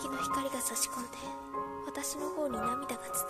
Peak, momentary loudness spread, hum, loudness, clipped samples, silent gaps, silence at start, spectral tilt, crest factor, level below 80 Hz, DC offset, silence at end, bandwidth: -16 dBFS; 8 LU; none; -35 LUFS; under 0.1%; none; 0 s; -2.5 dB/octave; 20 dB; -62 dBFS; under 0.1%; 0 s; 14 kHz